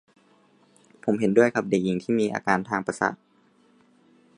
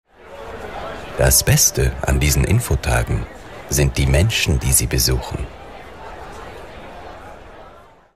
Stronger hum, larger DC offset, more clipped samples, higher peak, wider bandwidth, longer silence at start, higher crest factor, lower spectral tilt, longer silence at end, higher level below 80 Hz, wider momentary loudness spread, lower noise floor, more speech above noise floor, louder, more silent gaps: neither; second, under 0.1% vs 0.5%; neither; about the same, -4 dBFS vs -2 dBFS; second, 11 kHz vs 15.5 kHz; first, 1.05 s vs 0.25 s; about the same, 22 dB vs 18 dB; first, -6.5 dB/octave vs -3.5 dB/octave; first, 1.2 s vs 0.4 s; second, -66 dBFS vs -26 dBFS; second, 8 LU vs 22 LU; first, -61 dBFS vs -45 dBFS; first, 37 dB vs 28 dB; second, -24 LUFS vs -17 LUFS; neither